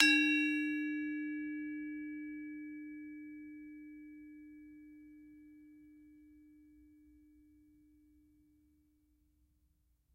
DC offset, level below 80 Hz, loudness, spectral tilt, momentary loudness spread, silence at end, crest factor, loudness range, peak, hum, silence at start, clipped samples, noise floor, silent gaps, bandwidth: under 0.1%; -76 dBFS; -36 LUFS; -1.5 dB/octave; 26 LU; 3.7 s; 32 dB; 25 LU; -8 dBFS; none; 0 s; under 0.1%; -75 dBFS; none; 13.5 kHz